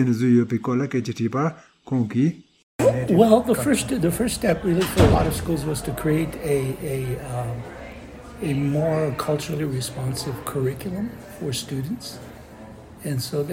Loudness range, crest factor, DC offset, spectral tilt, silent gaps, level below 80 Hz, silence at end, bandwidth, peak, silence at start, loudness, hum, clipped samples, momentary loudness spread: 8 LU; 20 dB; under 0.1%; -6 dB/octave; 2.63-2.79 s; -40 dBFS; 0 s; 16.5 kHz; -2 dBFS; 0 s; -23 LUFS; none; under 0.1%; 18 LU